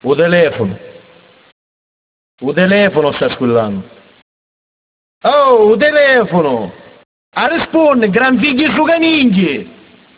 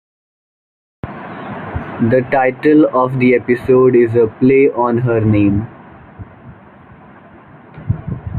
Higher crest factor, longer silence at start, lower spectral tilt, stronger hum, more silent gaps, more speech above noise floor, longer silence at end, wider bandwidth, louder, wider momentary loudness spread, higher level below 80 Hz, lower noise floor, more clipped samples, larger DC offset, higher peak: about the same, 14 dB vs 14 dB; second, 0.05 s vs 1.05 s; about the same, -9.5 dB/octave vs -10.5 dB/octave; neither; first, 1.52-2.38 s, 4.22-5.21 s, 7.05-7.32 s vs none; first, 33 dB vs 29 dB; first, 0.5 s vs 0 s; second, 4 kHz vs 4.5 kHz; about the same, -11 LUFS vs -13 LUFS; second, 12 LU vs 18 LU; second, -50 dBFS vs -42 dBFS; first, -44 dBFS vs -40 dBFS; neither; neither; about the same, 0 dBFS vs -2 dBFS